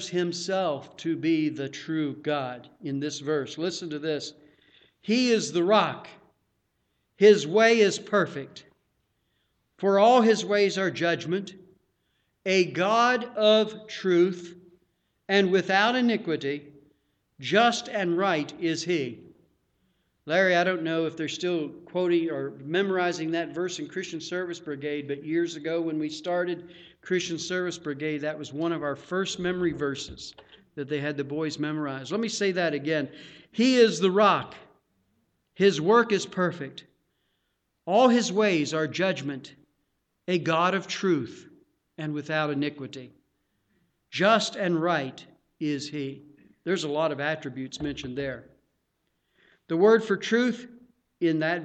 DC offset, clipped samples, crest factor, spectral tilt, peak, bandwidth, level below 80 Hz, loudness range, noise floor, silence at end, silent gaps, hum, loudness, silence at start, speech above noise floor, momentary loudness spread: under 0.1%; under 0.1%; 20 dB; -4.5 dB/octave; -6 dBFS; 9 kHz; -66 dBFS; 7 LU; -76 dBFS; 0 s; none; none; -26 LUFS; 0 s; 51 dB; 15 LU